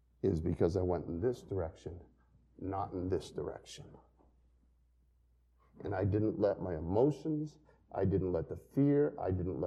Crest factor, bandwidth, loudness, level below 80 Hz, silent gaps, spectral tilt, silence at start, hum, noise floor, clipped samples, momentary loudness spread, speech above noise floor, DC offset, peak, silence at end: 18 dB; 11 kHz; -35 LUFS; -56 dBFS; none; -8.5 dB/octave; 0.25 s; none; -70 dBFS; under 0.1%; 15 LU; 35 dB; under 0.1%; -18 dBFS; 0 s